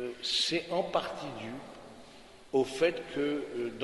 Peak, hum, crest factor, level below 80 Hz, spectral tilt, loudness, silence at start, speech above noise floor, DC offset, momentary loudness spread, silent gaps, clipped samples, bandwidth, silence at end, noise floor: -14 dBFS; none; 18 dB; -64 dBFS; -3.5 dB/octave; -32 LUFS; 0 s; 21 dB; under 0.1%; 21 LU; none; under 0.1%; 11.5 kHz; 0 s; -53 dBFS